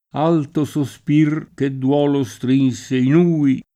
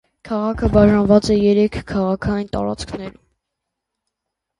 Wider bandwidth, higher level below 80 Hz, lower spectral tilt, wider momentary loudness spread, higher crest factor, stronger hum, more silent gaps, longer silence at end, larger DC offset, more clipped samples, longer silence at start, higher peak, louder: first, 13 kHz vs 11 kHz; second, -58 dBFS vs -34 dBFS; about the same, -7.5 dB/octave vs -7 dB/octave; second, 7 LU vs 14 LU; about the same, 14 dB vs 18 dB; neither; neither; second, 0.15 s vs 1.5 s; neither; neither; about the same, 0.15 s vs 0.25 s; second, -4 dBFS vs 0 dBFS; about the same, -18 LUFS vs -17 LUFS